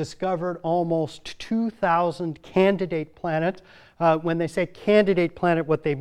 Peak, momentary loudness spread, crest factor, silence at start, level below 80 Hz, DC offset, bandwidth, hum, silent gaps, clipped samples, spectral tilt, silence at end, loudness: -6 dBFS; 8 LU; 18 dB; 0 s; -56 dBFS; under 0.1%; 12 kHz; none; none; under 0.1%; -7 dB/octave; 0 s; -24 LUFS